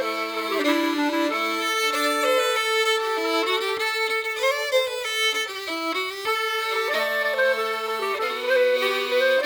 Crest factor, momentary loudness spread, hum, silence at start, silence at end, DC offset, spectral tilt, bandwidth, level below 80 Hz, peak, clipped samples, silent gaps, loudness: 14 dB; 5 LU; none; 0 s; 0 s; under 0.1%; -0.5 dB/octave; over 20 kHz; -72 dBFS; -10 dBFS; under 0.1%; none; -23 LUFS